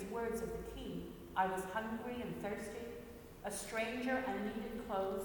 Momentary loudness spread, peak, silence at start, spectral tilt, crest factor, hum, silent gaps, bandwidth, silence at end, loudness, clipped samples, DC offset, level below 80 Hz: 10 LU; -22 dBFS; 0 s; -4.5 dB/octave; 18 dB; none; none; 19 kHz; 0 s; -41 LUFS; under 0.1%; under 0.1%; -58 dBFS